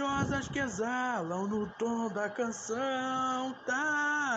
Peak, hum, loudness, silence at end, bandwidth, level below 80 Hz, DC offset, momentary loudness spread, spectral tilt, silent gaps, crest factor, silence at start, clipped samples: -18 dBFS; none; -33 LUFS; 0 s; 9 kHz; -60 dBFS; under 0.1%; 5 LU; -4.5 dB/octave; none; 16 dB; 0 s; under 0.1%